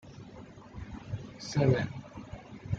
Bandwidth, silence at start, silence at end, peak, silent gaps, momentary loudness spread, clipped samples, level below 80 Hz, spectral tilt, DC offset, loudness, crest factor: 7.8 kHz; 0.05 s; 0 s; -12 dBFS; none; 21 LU; under 0.1%; -54 dBFS; -7 dB/octave; under 0.1%; -32 LUFS; 22 dB